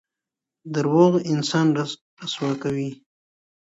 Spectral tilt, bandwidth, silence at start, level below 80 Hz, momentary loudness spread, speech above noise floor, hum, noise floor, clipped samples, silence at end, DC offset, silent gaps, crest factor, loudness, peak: -6 dB/octave; 8 kHz; 0.65 s; -68 dBFS; 14 LU; 65 dB; none; -87 dBFS; under 0.1%; 0.7 s; under 0.1%; 2.01-2.17 s; 20 dB; -22 LUFS; -4 dBFS